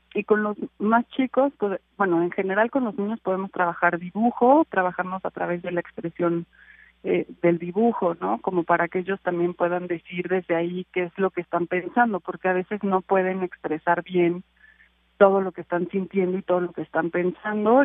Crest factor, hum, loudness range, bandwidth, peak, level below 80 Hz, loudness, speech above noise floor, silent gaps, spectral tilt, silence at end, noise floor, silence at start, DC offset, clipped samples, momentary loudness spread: 22 dB; none; 3 LU; 3.8 kHz; -2 dBFS; -66 dBFS; -24 LUFS; 35 dB; none; -11 dB/octave; 0 s; -59 dBFS; 0.15 s; under 0.1%; under 0.1%; 8 LU